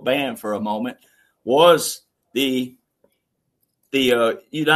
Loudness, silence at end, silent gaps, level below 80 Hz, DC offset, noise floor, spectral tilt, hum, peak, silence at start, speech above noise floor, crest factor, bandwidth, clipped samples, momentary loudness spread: -20 LUFS; 0 s; none; -64 dBFS; under 0.1%; -73 dBFS; -3.5 dB/octave; none; -2 dBFS; 0 s; 54 dB; 20 dB; 13.5 kHz; under 0.1%; 16 LU